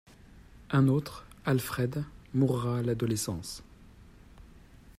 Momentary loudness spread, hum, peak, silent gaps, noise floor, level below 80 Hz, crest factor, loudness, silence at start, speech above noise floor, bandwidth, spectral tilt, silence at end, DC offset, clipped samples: 12 LU; none; -14 dBFS; none; -54 dBFS; -54 dBFS; 18 dB; -30 LUFS; 0.35 s; 25 dB; 16 kHz; -6.5 dB/octave; 0.05 s; under 0.1%; under 0.1%